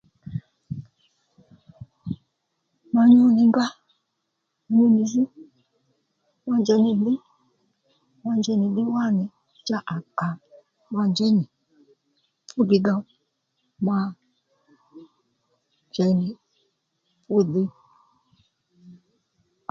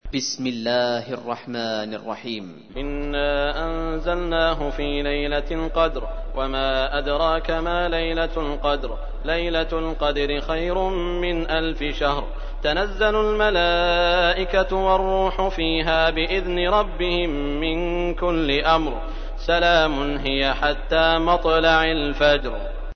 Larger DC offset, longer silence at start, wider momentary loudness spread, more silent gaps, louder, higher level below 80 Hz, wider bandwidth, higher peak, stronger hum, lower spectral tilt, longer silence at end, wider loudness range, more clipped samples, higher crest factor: neither; first, 0.25 s vs 0.05 s; first, 18 LU vs 11 LU; neither; about the same, -22 LUFS vs -22 LUFS; second, -66 dBFS vs -28 dBFS; about the same, 7.2 kHz vs 6.6 kHz; about the same, -6 dBFS vs -4 dBFS; neither; first, -7 dB/octave vs -4.5 dB/octave; first, 0.8 s vs 0 s; first, 8 LU vs 5 LU; neither; about the same, 20 dB vs 18 dB